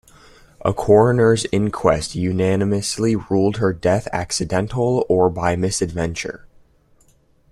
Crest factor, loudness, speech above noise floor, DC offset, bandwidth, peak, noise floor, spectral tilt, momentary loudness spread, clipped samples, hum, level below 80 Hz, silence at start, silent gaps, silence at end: 18 dB; -19 LUFS; 38 dB; under 0.1%; 13.5 kHz; -2 dBFS; -56 dBFS; -5.5 dB/octave; 9 LU; under 0.1%; none; -44 dBFS; 0.65 s; none; 1.05 s